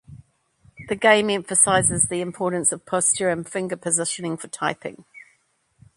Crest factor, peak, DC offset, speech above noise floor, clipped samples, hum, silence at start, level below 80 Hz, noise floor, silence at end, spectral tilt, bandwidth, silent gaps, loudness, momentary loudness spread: 22 dB; 0 dBFS; under 0.1%; 43 dB; under 0.1%; none; 0.1 s; -54 dBFS; -65 dBFS; 0.75 s; -2.5 dB/octave; 11.5 kHz; none; -21 LUFS; 12 LU